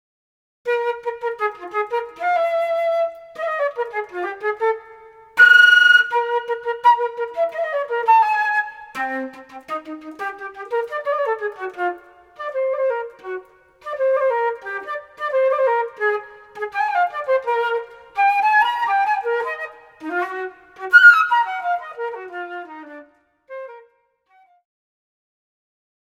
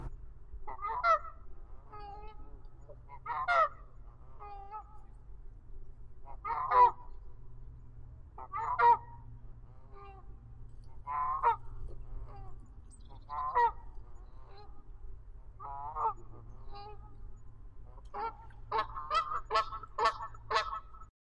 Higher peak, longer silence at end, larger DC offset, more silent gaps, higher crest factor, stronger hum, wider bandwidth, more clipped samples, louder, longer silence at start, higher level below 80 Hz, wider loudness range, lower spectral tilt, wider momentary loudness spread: first, 0 dBFS vs -14 dBFS; first, 2.25 s vs 0.15 s; neither; neither; about the same, 20 dB vs 22 dB; neither; first, 15.5 kHz vs 10 kHz; neither; first, -18 LUFS vs -32 LUFS; first, 0.65 s vs 0 s; second, -70 dBFS vs -50 dBFS; about the same, 11 LU vs 10 LU; second, -1 dB/octave vs -4 dB/octave; second, 19 LU vs 26 LU